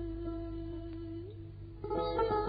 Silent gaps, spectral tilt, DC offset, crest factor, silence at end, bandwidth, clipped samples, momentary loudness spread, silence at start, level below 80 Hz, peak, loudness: none; -6 dB/octave; under 0.1%; 18 dB; 0 s; 4.9 kHz; under 0.1%; 14 LU; 0 s; -48 dBFS; -20 dBFS; -39 LUFS